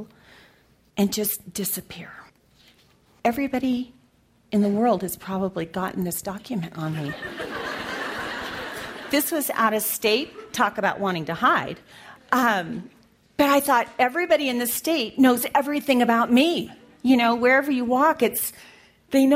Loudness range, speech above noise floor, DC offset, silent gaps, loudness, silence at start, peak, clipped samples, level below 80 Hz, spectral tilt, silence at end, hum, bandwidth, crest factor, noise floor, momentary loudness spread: 9 LU; 38 dB; under 0.1%; none; -23 LUFS; 0 s; -4 dBFS; under 0.1%; -60 dBFS; -4 dB/octave; 0 s; none; 16 kHz; 20 dB; -60 dBFS; 13 LU